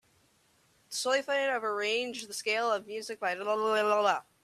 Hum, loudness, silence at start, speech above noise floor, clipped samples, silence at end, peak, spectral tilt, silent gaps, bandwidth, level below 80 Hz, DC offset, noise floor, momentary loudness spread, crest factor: none; -30 LUFS; 0.9 s; 37 dB; under 0.1%; 0.25 s; -14 dBFS; -1.5 dB/octave; none; 14.5 kHz; -82 dBFS; under 0.1%; -68 dBFS; 8 LU; 18 dB